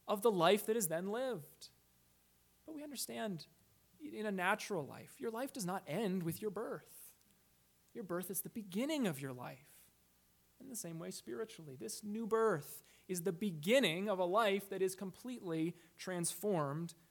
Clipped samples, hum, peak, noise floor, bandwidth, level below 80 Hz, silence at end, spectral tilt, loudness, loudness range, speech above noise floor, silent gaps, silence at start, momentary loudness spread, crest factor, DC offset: under 0.1%; none; -18 dBFS; -72 dBFS; 19 kHz; -82 dBFS; 0.2 s; -4.5 dB/octave; -39 LUFS; 8 LU; 34 dB; none; 0.05 s; 18 LU; 22 dB; under 0.1%